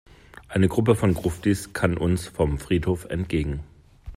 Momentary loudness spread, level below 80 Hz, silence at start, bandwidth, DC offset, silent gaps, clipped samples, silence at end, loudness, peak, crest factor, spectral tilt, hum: 7 LU; -40 dBFS; 0.35 s; 16 kHz; under 0.1%; none; under 0.1%; 0 s; -24 LUFS; -6 dBFS; 18 dB; -7 dB/octave; none